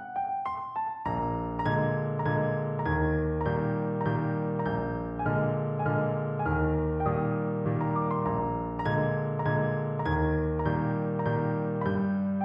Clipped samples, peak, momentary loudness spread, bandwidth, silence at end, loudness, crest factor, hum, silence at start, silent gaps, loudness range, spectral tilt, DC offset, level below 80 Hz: under 0.1%; -16 dBFS; 4 LU; 5.4 kHz; 0 s; -29 LUFS; 14 dB; none; 0 s; none; 1 LU; -11 dB/octave; under 0.1%; -44 dBFS